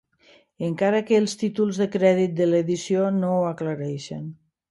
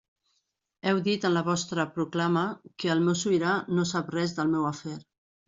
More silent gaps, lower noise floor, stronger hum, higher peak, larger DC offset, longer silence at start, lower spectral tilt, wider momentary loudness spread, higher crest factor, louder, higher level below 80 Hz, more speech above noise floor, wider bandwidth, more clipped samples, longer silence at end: neither; second, -57 dBFS vs -77 dBFS; neither; first, -6 dBFS vs -10 dBFS; neither; second, 0.6 s vs 0.85 s; first, -6.5 dB/octave vs -5 dB/octave; first, 11 LU vs 8 LU; about the same, 18 dB vs 18 dB; first, -23 LUFS vs -27 LUFS; about the same, -68 dBFS vs -68 dBFS; second, 35 dB vs 50 dB; first, 11.5 kHz vs 7.8 kHz; neither; about the same, 0.35 s vs 0.45 s